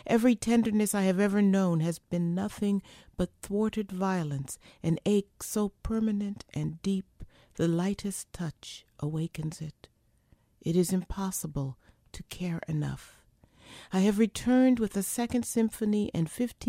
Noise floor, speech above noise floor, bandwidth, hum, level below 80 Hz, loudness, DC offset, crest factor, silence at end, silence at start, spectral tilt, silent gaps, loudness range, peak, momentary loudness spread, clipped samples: -65 dBFS; 36 dB; 16 kHz; none; -52 dBFS; -30 LUFS; under 0.1%; 18 dB; 0 s; 0.05 s; -6 dB/octave; none; 6 LU; -12 dBFS; 13 LU; under 0.1%